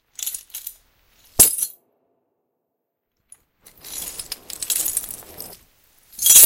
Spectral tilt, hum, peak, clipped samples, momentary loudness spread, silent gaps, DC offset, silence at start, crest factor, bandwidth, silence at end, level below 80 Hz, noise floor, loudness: 0.5 dB/octave; none; 0 dBFS; under 0.1%; 23 LU; none; under 0.1%; 0.2 s; 22 dB; 17.5 kHz; 0 s; -50 dBFS; -78 dBFS; -19 LUFS